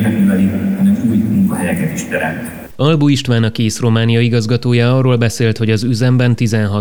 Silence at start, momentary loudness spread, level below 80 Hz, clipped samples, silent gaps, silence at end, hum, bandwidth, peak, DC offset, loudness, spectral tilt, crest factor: 0 s; 6 LU; -46 dBFS; under 0.1%; none; 0 s; none; over 20 kHz; 0 dBFS; under 0.1%; -14 LUFS; -6.5 dB/octave; 12 dB